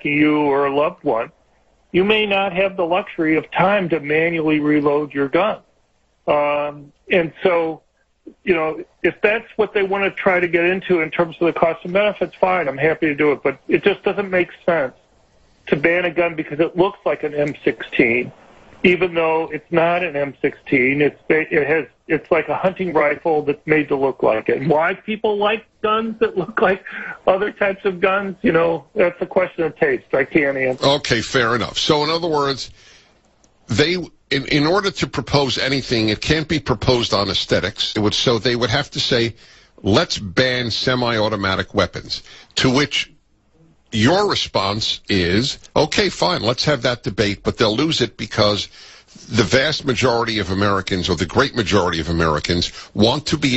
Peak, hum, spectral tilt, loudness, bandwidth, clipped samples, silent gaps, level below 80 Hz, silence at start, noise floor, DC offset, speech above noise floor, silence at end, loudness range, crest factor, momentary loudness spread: 0 dBFS; none; -5 dB/octave; -18 LUFS; 8.2 kHz; under 0.1%; none; -44 dBFS; 0.05 s; -61 dBFS; under 0.1%; 42 dB; 0 s; 2 LU; 18 dB; 6 LU